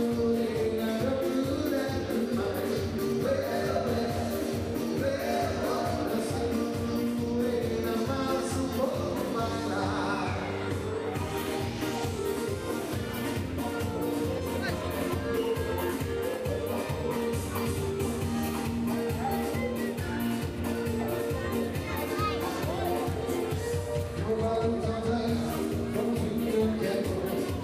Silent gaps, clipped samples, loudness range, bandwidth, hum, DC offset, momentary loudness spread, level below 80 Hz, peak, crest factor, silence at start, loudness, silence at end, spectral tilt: none; under 0.1%; 2 LU; 16 kHz; none; under 0.1%; 3 LU; -48 dBFS; -16 dBFS; 14 dB; 0 s; -30 LUFS; 0 s; -6 dB/octave